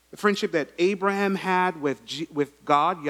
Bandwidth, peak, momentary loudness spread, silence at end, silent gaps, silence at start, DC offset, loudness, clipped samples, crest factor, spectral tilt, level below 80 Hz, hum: 15 kHz; -6 dBFS; 7 LU; 0 s; none; 0.2 s; under 0.1%; -25 LUFS; under 0.1%; 20 dB; -5 dB/octave; -68 dBFS; none